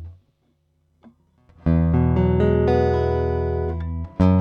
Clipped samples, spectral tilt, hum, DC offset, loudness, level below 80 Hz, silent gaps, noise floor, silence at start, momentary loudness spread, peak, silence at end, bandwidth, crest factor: under 0.1%; -10.5 dB/octave; none; under 0.1%; -21 LUFS; -30 dBFS; none; -66 dBFS; 0 s; 9 LU; -6 dBFS; 0 s; 6 kHz; 14 dB